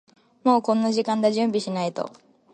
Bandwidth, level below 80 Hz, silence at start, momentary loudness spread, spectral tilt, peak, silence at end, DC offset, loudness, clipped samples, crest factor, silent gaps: 9.4 kHz; -72 dBFS; 0.45 s; 9 LU; -5.5 dB/octave; -6 dBFS; 0.45 s; under 0.1%; -23 LUFS; under 0.1%; 18 dB; none